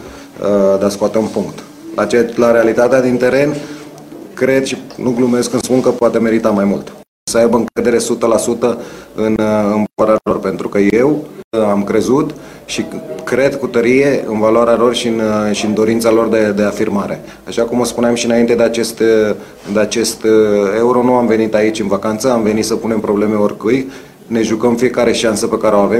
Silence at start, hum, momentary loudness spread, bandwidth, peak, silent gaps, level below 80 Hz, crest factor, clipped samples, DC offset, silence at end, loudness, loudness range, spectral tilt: 0 s; none; 10 LU; 16 kHz; 0 dBFS; 7.08-7.27 s, 11.44-11.51 s; -46 dBFS; 14 dB; under 0.1%; under 0.1%; 0 s; -14 LUFS; 2 LU; -5 dB/octave